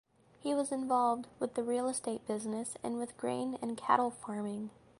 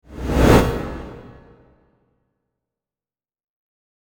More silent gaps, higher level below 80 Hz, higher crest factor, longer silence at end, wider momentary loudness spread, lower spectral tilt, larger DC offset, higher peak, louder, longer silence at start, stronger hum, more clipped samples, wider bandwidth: neither; second, -74 dBFS vs -30 dBFS; about the same, 24 dB vs 22 dB; second, 0.3 s vs 2.85 s; second, 8 LU vs 21 LU; second, -4.5 dB/octave vs -6.5 dB/octave; neither; second, -12 dBFS vs 0 dBFS; second, -35 LUFS vs -17 LUFS; first, 0.4 s vs 0.1 s; neither; neither; second, 11.5 kHz vs 19 kHz